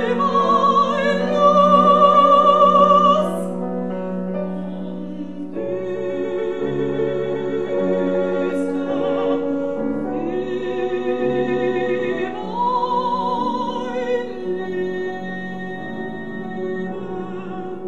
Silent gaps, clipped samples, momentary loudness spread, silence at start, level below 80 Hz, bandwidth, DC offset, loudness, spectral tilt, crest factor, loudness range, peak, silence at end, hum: none; under 0.1%; 16 LU; 0 s; -56 dBFS; 11.5 kHz; 1%; -19 LUFS; -7 dB/octave; 18 dB; 12 LU; -2 dBFS; 0 s; none